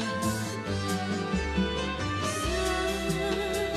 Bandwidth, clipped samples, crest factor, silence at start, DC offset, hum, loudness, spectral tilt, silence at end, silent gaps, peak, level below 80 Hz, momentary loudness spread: 14.5 kHz; under 0.1%; 14 dB; 0 s; under 0.1%; none; -29 LUFS; -4.5 dB/octave; 0 s; none; -16 dBFS; -40 dBFS; 3 LU